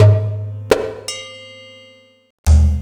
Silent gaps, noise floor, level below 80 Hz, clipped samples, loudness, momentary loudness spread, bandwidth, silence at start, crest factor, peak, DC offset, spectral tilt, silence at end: 2.30-2.44 s; -47 dBFS; -20 dBFS; under 0.1%; -18 LUFS; 23 LU; 13 kHz; 0 s; 16 dB; 0 dBFS; under 0.1%; -6 dB/octave; 0 s